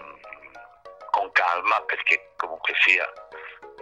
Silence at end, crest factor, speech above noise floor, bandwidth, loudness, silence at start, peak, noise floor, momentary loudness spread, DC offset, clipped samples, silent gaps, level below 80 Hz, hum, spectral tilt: 0 s; 22 dB; 23 dB; 12 kHz; -22 LUFS; 0 s; -4 dBFS; -47 dBFS; 24 LU; under 0.1%; under 0.1%; none; -70 dBFS; none; -0.5 dB/octave